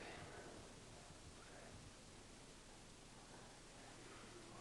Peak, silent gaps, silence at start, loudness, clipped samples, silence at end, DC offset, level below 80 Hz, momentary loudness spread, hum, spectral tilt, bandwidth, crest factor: -44 dBFS; none; 0 s; -59 LUFS; under 0.1%; 0 s; under 0.1%; -68 dBFS; 4 LU; none; -3.5 dB/octave; 11.5 kHz; 16 dB